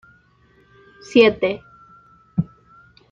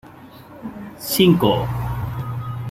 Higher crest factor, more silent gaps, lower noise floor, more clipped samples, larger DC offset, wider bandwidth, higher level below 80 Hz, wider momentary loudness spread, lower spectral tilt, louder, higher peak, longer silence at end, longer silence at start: about the same, 20 dB vs 20 dB; neither; first, -56 dBFS vs -42 dBFS; neither; neither; second, 7.6 kHz vs 16.5 kHz; second, -54 dBFS vs -40 dBFS; second, 17 LU vs 20 LU; about the same, -6.5 dB/octave vs -6 dB/octave; about the same, -19 LUFS vs -19 LUFS; about the same, -2 dBFS vs -2 dBFS; first, 0.7 s vs 0 s; first, 1.1 s vs 0.05 s